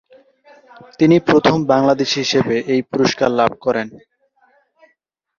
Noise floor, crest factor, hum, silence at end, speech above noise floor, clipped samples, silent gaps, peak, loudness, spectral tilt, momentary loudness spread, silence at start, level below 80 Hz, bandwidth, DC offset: -66 dBFS; 16 dB; none; 1.45 s; 51 dB; under 0.1%; none; -2 dBFS; -16 LUFS; -5.5 dB/octave; 7 LU; 1 s; -56 dBFS; 7.4 kHz; under 0.1%